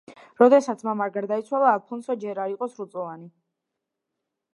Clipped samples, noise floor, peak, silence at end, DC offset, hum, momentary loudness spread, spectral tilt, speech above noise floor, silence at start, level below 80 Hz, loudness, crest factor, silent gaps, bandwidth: under 0.1%; -83 dBFS; -2 dBFS; 1.25 s; under 0.1%; none; 17 LU; -6 dB/octave; 60 dB; 0.1 s; -80 dBFS; -23 LUFS; 22 dB; none; 11 kHz